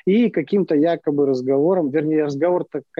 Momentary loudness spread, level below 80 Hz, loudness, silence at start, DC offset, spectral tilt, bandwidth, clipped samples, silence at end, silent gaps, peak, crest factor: 3 LU; -68 dBFS; -19 LUFS; 0.05 s; under 0.1%; -8.5 dB/octave; 7.2 kHz; under 0.1%; 0.2 s; none; -8 dBFS; 10 dB